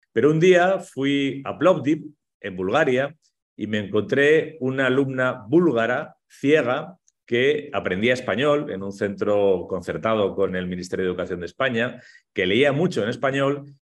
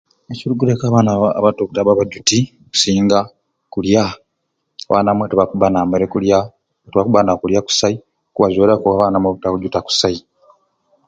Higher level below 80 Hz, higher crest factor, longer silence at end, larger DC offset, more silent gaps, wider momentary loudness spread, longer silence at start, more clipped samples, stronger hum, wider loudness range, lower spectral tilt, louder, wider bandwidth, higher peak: second, -62 dBFS vs -46 dBFS; about the same, 18 dB vs 16 dB; second, 0.1 s vs 0.9 s; neither; first, 2.34-2.40 s, 3.42-3.56 s vs none; about the same, 10 LU vs 11 LU; second, 0.15 s vs 0.3 s; neither; neither; about the same, 3 LU vs 2 LU; about the same, -6 dB/octave vs -5 dB/octave; second, -22 LUFS vs -15 LUFS; first, 11.5 kHz vs 9.4 kHz; second, -4 dBFS vs 0 dBFS